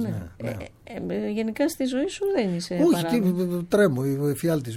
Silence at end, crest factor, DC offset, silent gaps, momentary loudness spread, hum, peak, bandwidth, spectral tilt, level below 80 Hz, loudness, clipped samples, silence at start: 0 s; 16 dB; under 0.1%; none; 12 LU; none; -8 dBFS; 17 kHz; -6.5 dB/octave; -54 dBFS; -25 LUFS; under 0.1%; 0 s